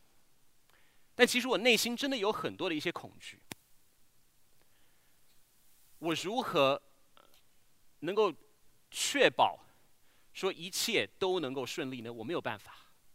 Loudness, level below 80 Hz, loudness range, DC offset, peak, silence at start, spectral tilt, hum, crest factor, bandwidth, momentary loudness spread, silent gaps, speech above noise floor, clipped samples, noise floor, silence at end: -32 LUFS; -76 dBFS; 10 LU; under 0.1%; -8 dBFS; 1.2 s; -2.5 dB/octave; none; 26 dB; 16 kHz; 22 LU; none; 31 dB; under 0.1%; -64 dBFS; 0.35 s